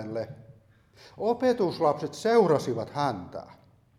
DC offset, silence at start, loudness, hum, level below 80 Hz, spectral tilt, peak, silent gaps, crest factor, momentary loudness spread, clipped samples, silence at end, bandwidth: under 0.1%; 0 s; -27 LUFS; none; -66 dBFS; -6 dB/octave; -8 dBFS; none; 20 dB; 16 LU; under 0.1%; 0.45 s; 13 kHz